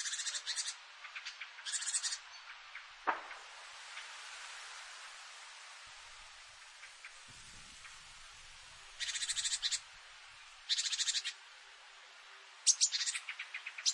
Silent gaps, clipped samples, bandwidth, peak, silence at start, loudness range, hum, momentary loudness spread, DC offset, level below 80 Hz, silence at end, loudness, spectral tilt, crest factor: none; under 0.1%; 11.5 kHz; -14 dBFS; 0 s; 16 LU; none; 20 LU; under 0.1%; -74 dBFS; 0 s; -37 LUFS; 3.5 dB/octave; 28 dB